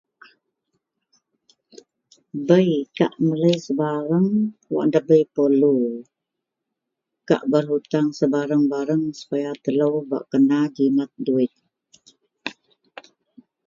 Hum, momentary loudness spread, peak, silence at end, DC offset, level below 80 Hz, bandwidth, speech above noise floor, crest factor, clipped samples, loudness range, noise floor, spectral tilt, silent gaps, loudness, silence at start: none; 9 LU; -2 dBFS; 1.15 s; under 0.1%; -70 dBFS; 7.4 kHz; 63 dB; 20 dB; under 0.1%; 4 LU; -82 dBFS; -7.5 dB/octave; none; -21 LUFS; 2.35 s